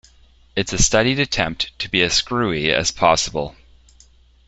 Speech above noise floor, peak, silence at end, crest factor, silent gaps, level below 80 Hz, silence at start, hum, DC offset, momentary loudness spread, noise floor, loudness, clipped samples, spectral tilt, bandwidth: 32 dB; 0 dBFS; 0.95 s; 20 dB; none; -36 dBFS; 0.55 s; none; under 0.1%; 9 LU; -51 dBFS; -18 LUFS; under 0.1%; -3 dB/octave; 8.4 kHz